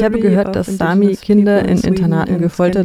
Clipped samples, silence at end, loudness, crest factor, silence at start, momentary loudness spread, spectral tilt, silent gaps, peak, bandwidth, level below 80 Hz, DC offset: under 0.1%; 0 s; -14 LUFS; 12 dB; 0 s; 4 LU; -8 dB/octave; none; 0 dBFS; 13 kHz; -38 dBFS; under 0.1%